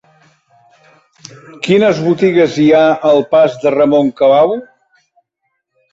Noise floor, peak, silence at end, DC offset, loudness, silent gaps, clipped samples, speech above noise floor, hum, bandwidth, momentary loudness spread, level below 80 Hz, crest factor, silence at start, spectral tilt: -70 dBFS; -2 dBFS; 1.3 s; under 0.1%; -11 LUFS; none; under 0.1%; 59 dB; none; 7.8 kHz; 4 LU; -56 dBFS; 12 dB; 1.6 s; -6.5 dB/octave